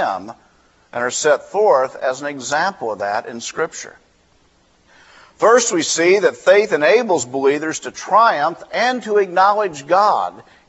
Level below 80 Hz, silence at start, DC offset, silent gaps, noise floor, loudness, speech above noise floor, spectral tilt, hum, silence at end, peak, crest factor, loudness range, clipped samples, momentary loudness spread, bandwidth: -64 dBFS; 0 s; under 0.1%; none; -56 dBFS; -17 LUFS; 39 dB; -2.5 dB/octave; none; 0.3 s; 0 dBFS; 16 dB; 7 LU; under 0.1%; 12 LU; 8.2 kHz